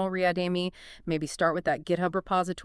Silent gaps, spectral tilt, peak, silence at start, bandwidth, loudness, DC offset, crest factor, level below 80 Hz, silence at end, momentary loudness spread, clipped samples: none; -5.5 dB/octave; -12 dBFS; 0 s; 12 kHz; -28 LUFS; under 0.1%; 16 dB; -56 dBFS; 0 s; 6 LU; under 0.1%